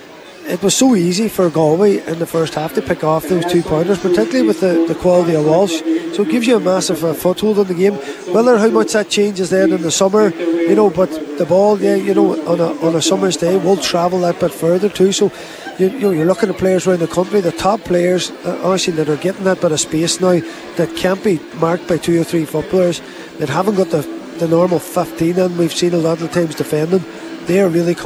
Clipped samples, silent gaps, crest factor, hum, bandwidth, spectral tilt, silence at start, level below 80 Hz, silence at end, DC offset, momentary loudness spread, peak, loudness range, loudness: under 0.1%; none; 14 dB; none; over 20 kHz; -5 dB/octave; 0 s; -50 dBFS; 0 s; under 0.1%; 6 LU; -2 dBFS; 3 LU; -15 LUFS